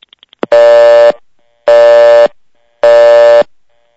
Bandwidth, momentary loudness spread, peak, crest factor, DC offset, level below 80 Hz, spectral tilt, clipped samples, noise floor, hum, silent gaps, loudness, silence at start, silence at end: 8 kHz; 12 LU; 0 dBFS; 6 dB; under 0.1%; -54 dBFS; -3.5 dB/octave; 5%; -50 dBFS; none; none; -5 LUFS; 0.5 s; 0.55 s